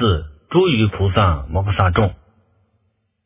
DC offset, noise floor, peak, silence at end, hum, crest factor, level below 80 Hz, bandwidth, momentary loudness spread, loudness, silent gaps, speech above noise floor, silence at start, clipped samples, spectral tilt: under 0.1%; -66 dBFS; 0 dBFS; 1.1 s; none; 18 dB; -28 dBFS; 3.8 kHz; 6 LU; -18 LUFS; none; 50 dB; 0 s; under 0.1%; -11 dB/octave